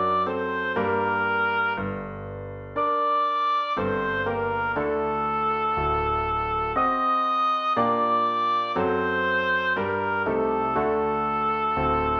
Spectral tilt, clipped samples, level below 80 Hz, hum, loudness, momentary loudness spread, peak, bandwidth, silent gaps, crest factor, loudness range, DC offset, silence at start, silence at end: -7 dB/octave; under 0.1%; -46 dBFS; none; -24 LUFS; 4 LU; -10 dBFS; 6.6 kHz; none; 14 dB; 2 LU; under 0.1%; 0 s; 0 s